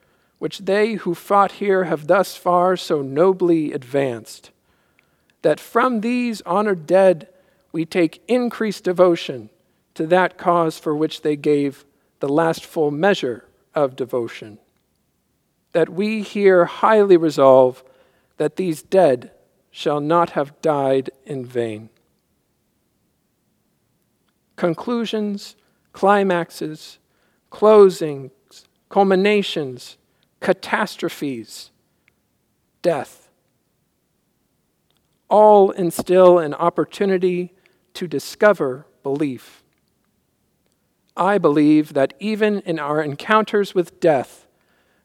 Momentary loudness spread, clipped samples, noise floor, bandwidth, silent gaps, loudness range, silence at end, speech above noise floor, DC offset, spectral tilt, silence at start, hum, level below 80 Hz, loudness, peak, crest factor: 15 LU; under 0.1%; -68 dBFS; 15.5 kHz; none; 10 LU; 0.8 s; 50 dB; under 0.1%; -6 dB/octave; 0.4 s; none; -70 dBFS; -18 LUFS; 0 dBFS; 20 dB